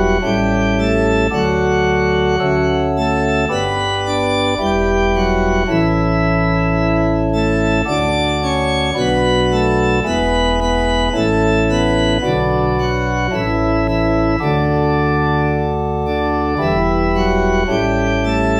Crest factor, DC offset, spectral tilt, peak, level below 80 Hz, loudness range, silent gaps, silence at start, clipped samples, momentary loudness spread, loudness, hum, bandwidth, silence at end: 14 dB; under 0.1%; -6 dB/octave; -2 dBFS; -24 dBFS; 1 LU; none; 0 s; under 0.1%; 3 LU; -16 LUFS; none; 10.5 kHz; 0 s